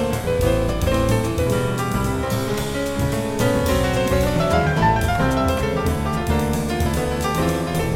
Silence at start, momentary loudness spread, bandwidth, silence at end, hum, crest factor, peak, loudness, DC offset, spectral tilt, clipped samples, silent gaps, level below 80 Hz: 0 s; 4 LU; 17 kHz; 0 s; none; 14 dB; -4 dBFS; -20 LUFS; under 0.1%; -6 dB/octave; under 0.1%; none; -30 dBFS